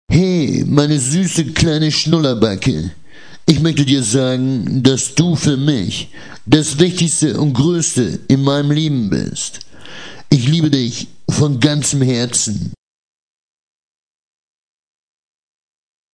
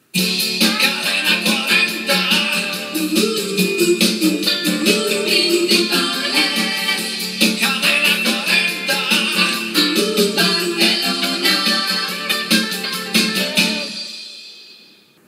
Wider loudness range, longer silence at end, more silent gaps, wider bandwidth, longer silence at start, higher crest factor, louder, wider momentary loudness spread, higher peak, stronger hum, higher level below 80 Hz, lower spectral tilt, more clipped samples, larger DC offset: about the same, 3 LU vs 2 LU; first, 3.4 s vs 0.55 s; neither; second, 10.5 kHz vs 16 kHz; about the same, 0.1 s vs 0.15 s; about the same, 16 dB vs 18 dB; about the same, -15 LUFS vs -15 LUFS; first, 10 LU vs 5 LU; about the same, 0 dBFS vs 0 dBFS; neither; first, -42 dBFS vs -82 dBFS; first, -5 dB/octave vs -2.5 dB/octave; first, 0.1% vs under 0.1%; first, 0.6% vs under 0.1%